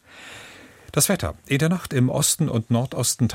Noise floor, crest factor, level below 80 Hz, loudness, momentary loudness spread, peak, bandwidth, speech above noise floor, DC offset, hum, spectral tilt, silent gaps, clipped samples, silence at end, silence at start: -45 dBFS; 16 dB; -48 dBFS; -22 LUFS; 20 LU; -6 dBFS; 16.5 kHz; 23 dB; under 0.1%; none; -4.5 dB/octave; none; under 0.1%; 0 s; 0.15 s